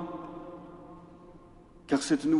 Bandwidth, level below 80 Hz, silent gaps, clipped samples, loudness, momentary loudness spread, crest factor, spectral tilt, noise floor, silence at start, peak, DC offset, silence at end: 11.5 kHz; -60 dBFS; none; under 0.1%; -32 LUFS; 26 LU; 18 dB; -5 dB/octave; -54 dBFS; 0 s; -14 dBFS; under 0.1%; 0 s